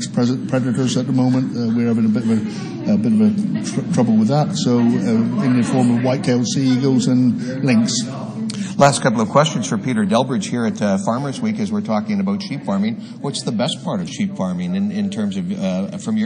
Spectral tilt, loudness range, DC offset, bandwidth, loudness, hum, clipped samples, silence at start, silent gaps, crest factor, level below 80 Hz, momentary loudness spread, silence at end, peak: -6 dB/octave; 5 LU; under 0.1%; 10.5 kHz; -18 LUFS; none; under 0.1%; 0 s; none; 18 dB; -62 dBFS; 7 LU; 0 s; 0 dBFS